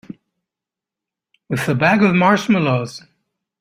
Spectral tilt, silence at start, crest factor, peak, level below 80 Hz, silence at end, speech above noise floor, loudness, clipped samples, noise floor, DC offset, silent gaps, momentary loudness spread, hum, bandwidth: -6.5 dB/octave; 0.1 s; 18 dB; -2 dBFS; -56 dBFS; 0.65 s; 71 dB; -16 LUFS; under 0.1%; -87 dBFS; under 0.1%; none; 14 LU; none; 15.5 kHz